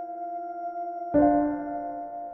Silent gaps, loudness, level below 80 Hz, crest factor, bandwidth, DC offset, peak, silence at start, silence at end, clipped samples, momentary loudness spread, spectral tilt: none; -28 LUFS; -54 dBFS; 18 dB; 2.2 kHz; under 0.1%; -10 dBFS; 0 s; 0 s; under 0.1%; 13 LU; -11.5 dB/octave